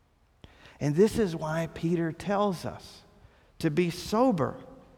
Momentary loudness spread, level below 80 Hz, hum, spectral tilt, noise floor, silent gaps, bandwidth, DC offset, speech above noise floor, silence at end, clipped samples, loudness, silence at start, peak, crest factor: 13 LU; -54 dBFS; none; -6.5 dB/octave; -58 dBFS; none; 17 kHz; under 0.1%; 30 dB; 0.15 s; under 0.1%; -28 LUFS; 0.8 s; -12 dBFS; 18 dB